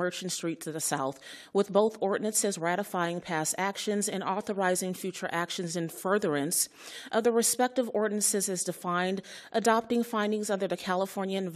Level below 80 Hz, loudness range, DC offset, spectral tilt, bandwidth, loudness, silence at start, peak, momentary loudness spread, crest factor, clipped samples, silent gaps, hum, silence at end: -78 dBFS; 3 LU; under 0.1%; -3.5 dB/octave; 14 kHz; -29 LUFS; 0 s; -10 dBFS; 7 LU; 20 dB; under 0.1%; none; none; 0 s